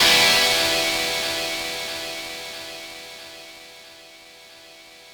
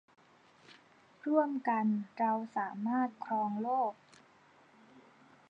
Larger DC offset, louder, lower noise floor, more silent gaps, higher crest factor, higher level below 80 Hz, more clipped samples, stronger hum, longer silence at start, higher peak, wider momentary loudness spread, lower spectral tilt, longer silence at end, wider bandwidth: neither; first, -20 LUFS vs -34 LUFS; second, -46 dBFS vs -63 dBFS; neither; about the same, 20 dB vs 20 dB; first, -54 dBFS vs under -90 dBFS; neither; neither; second, 0 s vs 0.7 s; first, -4 dBFS vs -16 dBFS; first, 25 LU vs 5 LU; second, -0.5 dB/octave vs -8.5 dB/octave; second, 0 s vs 0.5 s; first, over 20 kHz vs 7.6 kHz